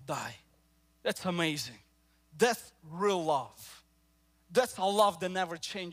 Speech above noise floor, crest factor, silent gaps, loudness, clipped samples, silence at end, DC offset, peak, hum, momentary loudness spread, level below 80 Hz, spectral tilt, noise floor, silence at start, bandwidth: 37 dB; 22 dB; none; -32 LUFS; under 0.1%; 0 s; under 0.1%; -12 dBFS; none; 16 LU; -70 dBFS; -4 dB/octave; -69 dBFS; 0 s; 16 kHz